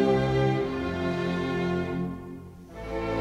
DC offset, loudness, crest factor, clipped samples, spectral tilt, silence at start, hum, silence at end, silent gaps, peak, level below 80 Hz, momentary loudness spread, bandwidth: under 0.1%; -28 LUFS; 16 dB; under 0.1%; -7.5 dB/octave; 0 s; none; 0 s; none; -12 dBFS; -46 dBFS; 17 LU; 10.5 kHz